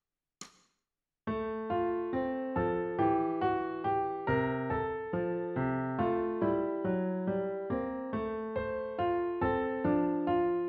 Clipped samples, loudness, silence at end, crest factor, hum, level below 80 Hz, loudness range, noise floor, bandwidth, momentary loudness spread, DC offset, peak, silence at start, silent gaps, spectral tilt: under 0.1%; -33 LUFS; 0 s; 14 dB; none; -56 dBFS; 2 LU; -89 dBFS; 7 kHz; 6 LU; under 0.1%; -18 dBFS; 0.4 s; none; -6.5 dB/octave